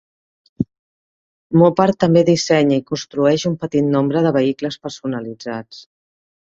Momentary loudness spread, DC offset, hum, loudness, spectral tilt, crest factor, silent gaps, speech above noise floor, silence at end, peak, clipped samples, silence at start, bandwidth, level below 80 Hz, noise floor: 13 LU; under 0.1%; none; -17 LUFS; -6.5 dB/octave; 16 dB; 0.79-1.50 s; over 74 dB; 0.75 s; -2 dBFS; under 0.1%; 0.6 s; 7.8 kHz; -56 dBFS; under -90 dBFS